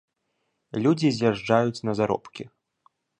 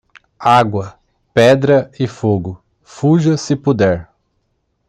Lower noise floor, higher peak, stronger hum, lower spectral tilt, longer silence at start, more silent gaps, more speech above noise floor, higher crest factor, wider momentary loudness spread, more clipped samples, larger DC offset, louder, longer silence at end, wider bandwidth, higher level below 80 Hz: first, -76 dBFS vs -66 dBFS; second, -6 dBFS vs 0 dBFS; neither; about the same, -6.5 dB/octave vs -6.5 dB/octave; first, 0.75 s vs 0.4 s; neither; about the same, 52 dB vs 52 dB; about the same, 20 dB vs 16 dB; first, 19 LU vs 12 LU; neither; neither; second, -24 LUFS vs -14 LUFS; about the same, 0.75 s vs 0.85 s; second, 9.4 kHz vs 11.5 kHz; second, -62 dBFS vs -50 dBFS